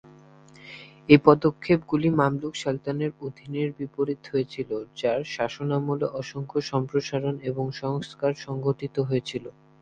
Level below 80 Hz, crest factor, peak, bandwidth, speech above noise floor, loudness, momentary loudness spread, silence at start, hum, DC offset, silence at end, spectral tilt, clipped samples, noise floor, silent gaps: -60 dBFS; 26 dB; 0 dBFS; 9 kHz; 26 dB; -26 LUFS; 13 LU; 0.05 s; none; under 0.1%; 0.3 s; -7 dB/octave; under 0.1%; -51 dBFS; none